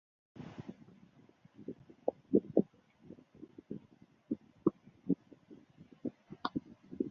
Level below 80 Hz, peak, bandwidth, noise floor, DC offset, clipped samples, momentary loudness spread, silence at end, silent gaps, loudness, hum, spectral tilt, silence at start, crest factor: -72 dBFS; -12 dBFS; 6.6 kHz; -64 dBFS; under 0.1%; under 0.1%; 25 LU; 0 s; none; -39 LUFS; none; -7.5 dB/octave; 0.35 s; 28 dB